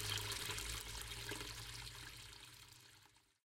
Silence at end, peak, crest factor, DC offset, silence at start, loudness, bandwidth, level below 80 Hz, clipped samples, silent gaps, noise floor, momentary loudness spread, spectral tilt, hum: 0.3 s; -26 dBFS; 24 dB; under 0.1%; 0 s; -46 LUFS; 16.5 kHz; -60 dBFS; under 0.1%; none; -69 dBFS; 18 LU; -1.5 dB/octave; none